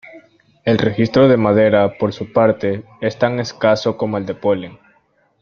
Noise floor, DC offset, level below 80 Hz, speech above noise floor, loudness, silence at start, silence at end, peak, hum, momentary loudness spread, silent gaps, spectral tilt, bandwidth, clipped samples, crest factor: -59 dBFS; under 0.1%; -52 dBFS; 43 dB; -16 LUFS; 0.15 s; 0.65 s; 0 dBFS; none; 10 LU; none; -7 dB/octave; 6.8 kHz; under 0.1%; 16 dB